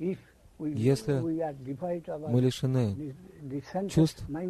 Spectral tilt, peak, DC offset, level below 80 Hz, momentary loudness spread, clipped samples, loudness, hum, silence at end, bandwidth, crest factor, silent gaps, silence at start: -7.5 dB/octave; -12 dBFS; under 0.1%; -56 dBFS; 13 LU; under 0.1%; -30 LUFS; none; 0 s; 13.5 kHz; 18 dB; none; 0 s